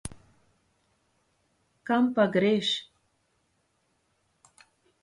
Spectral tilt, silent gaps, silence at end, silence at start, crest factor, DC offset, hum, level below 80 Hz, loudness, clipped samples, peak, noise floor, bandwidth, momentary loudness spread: -5 dB/octave; none; 2.2 s; 0.05 s; 20 dB; under 0.1%; none; -62 dBFS; -26 LUFS; under 0.1%; -10 dBFS; -73 dBFS; 11.5 kHz; 17 LU